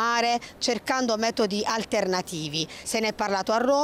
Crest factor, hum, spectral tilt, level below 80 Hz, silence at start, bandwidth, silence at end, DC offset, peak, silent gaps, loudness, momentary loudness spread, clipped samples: 12 dB; none; -3 dB/octave; -60 dBFS; 0 s; 16 kHz; 0 s; under 0.1%; -12 dBFS; none; -26 LUFS; 5 LU; under 0.1%